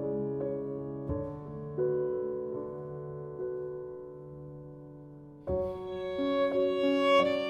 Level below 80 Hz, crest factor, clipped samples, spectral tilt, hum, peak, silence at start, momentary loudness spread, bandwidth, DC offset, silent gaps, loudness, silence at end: -56 dBFS; 18 dB; under 0.1%; -7 dB/octave; none; -14 dBFS; 0 s; 18 LU; 9 kHz; under 0.1%; none; -32 LUFS; 0 s